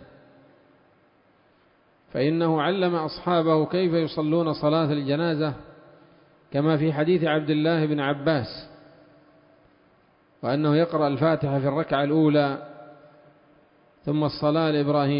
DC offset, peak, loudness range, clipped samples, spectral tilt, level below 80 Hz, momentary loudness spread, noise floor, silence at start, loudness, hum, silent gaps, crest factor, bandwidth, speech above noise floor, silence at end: under 0.1%; -8 dBFS; 4 LU; under 0.1%; -11.5 dB/octave; -62 dBFS; 7 LU; -61 dBFS; 2.15 s; -24 LUFS; none; none; 16 dB; 5.4 kHz; 38 dB; 0 s